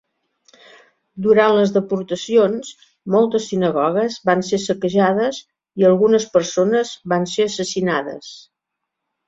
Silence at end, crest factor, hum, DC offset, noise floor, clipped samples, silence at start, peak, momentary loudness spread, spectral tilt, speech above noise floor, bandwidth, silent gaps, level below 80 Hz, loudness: 0.85 s; 18 dB; none; under 0.1%; -80 dBFS; under 0.1%; 1.15 s; -2 dBFS; 12 LU; -5 dB/octave; 63 dB; 7.8 kHz; none; -62 dBFS; -18 LUFS